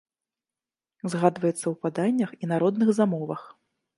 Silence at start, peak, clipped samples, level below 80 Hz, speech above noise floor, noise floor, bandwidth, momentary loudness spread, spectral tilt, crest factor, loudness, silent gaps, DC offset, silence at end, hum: 1.05 s; -6 dBFS; under 0.1%; -74 dBFS; over 65 dB; under -90 dBFS; 11.5 kHz; 11 LU; -7 dB/octave; 22 dB; -25 LUFS; none; under 0.1%; 0.5 s; none